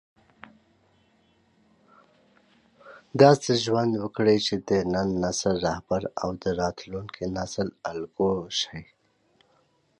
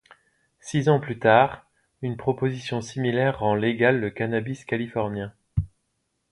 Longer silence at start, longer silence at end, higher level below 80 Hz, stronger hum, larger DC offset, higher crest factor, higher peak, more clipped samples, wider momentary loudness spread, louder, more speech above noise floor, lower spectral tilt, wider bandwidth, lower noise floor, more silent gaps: first, 2.85 s vs 0.65 s; first, 1.15 s vs 0.65 s; second, -54 dBFS vs -48 dBFS; neither; neither; about the same, 24 dB vs 22 dB; about the same, -4 dBFS vs -4 dBFS; neither; about the same, 14 LU vs 13 LU; about the same, -25 LUFS vs -24 LUFS; second, 41 dB vs 52 dB; second, -5 dB/octave vs -6.5 dB/octave; about the same, 11.5 kHz vs 11.5 kHz; second, -66 dBFS vs -75 dBFS; neither